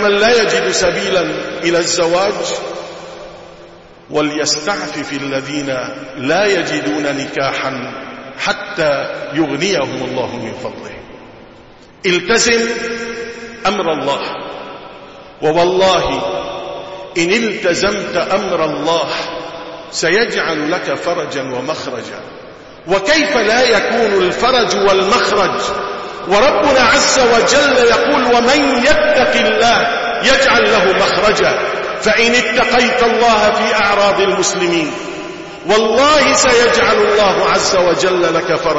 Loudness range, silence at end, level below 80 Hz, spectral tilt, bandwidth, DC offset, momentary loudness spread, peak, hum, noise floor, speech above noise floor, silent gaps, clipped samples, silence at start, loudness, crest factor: 7 LU; 0 s; -42 dBFS; -3 dB/octave; 8 kHz; under 0.1%; 15 LU; 0 dBFS; none; -40 dBFS; 27 dB; none; under 0.1%; 0 s; -13 LUFS; 14 dB